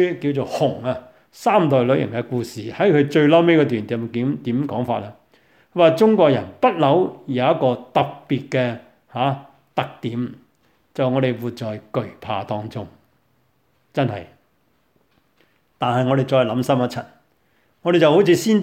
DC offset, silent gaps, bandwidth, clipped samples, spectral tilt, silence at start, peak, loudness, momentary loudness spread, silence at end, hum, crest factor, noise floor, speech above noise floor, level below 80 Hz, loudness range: under 0.1%; none; 16 kHz; under 0.1%; -7 dB/octave; 0 s; -2 dBFS; -20 LUFS; 14 LU; 0 s; none; 18 dB; -64 dBFS; 46 dB; -64 dBFS; 10 LU